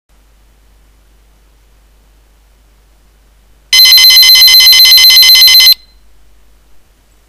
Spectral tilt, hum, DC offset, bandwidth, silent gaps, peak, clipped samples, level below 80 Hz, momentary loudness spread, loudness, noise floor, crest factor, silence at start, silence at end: 4 dB/octave; none; under 0.1%; over 20 kHz; none; 0 dBFS; 5%; -44 dBFS; 5 LU; 0 LUFS; -45 dBFS; 8 dB; 3.7 s; 1.55 s